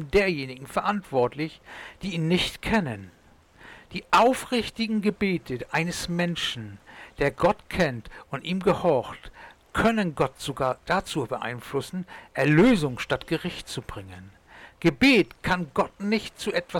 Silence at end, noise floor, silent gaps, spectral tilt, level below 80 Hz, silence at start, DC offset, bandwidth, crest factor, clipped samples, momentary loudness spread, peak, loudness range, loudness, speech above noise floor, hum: 0 s; -53 dBFS; none; -5.5 dB/octave; -48 dBFS; 0 s; under 0.1%; 18 kHz; 14 dB; under 0.1%; 17 LU; -12 dBFS; 3 LU; -25 LUFS; 27 dB; none